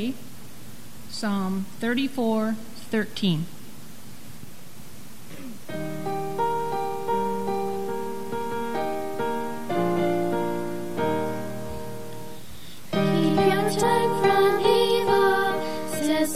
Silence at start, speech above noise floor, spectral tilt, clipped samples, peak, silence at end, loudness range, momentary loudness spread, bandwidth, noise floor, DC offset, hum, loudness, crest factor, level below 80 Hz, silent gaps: 0 s; 19 dB; -5.5 dB/octave; under 0.1%; -8 dBFS; 0 s; 10 LU; 23 LU; 16 kHz; -45 dBFS; 2%; none; -25 LUFS; 18 dB; -58 dBFS; none